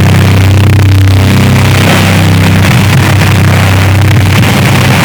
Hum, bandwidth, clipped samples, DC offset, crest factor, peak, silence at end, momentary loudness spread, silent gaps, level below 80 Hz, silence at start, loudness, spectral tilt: none; over 20 kHz; 3%; under 0.1%; 4 dB; 0 dBFS; 0 s; 1 LU; none; -26 dBFS; 0 s; -5 LUFS; -5.5 dB/octave